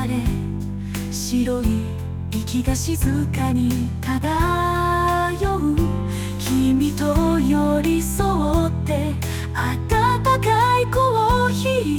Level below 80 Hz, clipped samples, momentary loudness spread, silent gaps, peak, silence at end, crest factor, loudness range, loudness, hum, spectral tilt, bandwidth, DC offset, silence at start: -30 dBFS; under 0.1%; 8 LU; none; -6 dBFS; 0 s; 12 dB; 3 LU; -20 LUFS; none; -6 dB/octave; 19.5 kHz; under 0.1%; 0 s